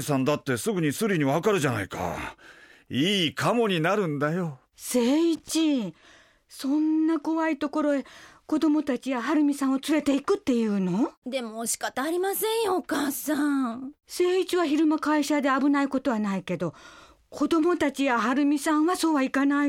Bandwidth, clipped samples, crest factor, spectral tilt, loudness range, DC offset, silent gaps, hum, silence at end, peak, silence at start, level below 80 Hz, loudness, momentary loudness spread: 16.5 kHz; under 0.1%; 14 dB; -5 dB/octave; 2 LU; under 0.1%; 11.17-11.22 s; none; 0 s; -12 dBFS; 0 s; -62 dBFS; -25 LUFS; 8 LU